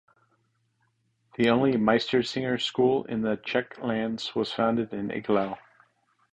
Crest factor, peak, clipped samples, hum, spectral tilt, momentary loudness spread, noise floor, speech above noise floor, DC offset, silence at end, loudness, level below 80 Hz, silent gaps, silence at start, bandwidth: 20 dB; -8 dBFS; under 0.1%; none; -6 dB/octave; 9 LU; -72 dBFS; 46 dB; under 0.1%; 0.75 s; -26 LUFS; -62 dBFS; none; 1.4 s; 9.2 kHz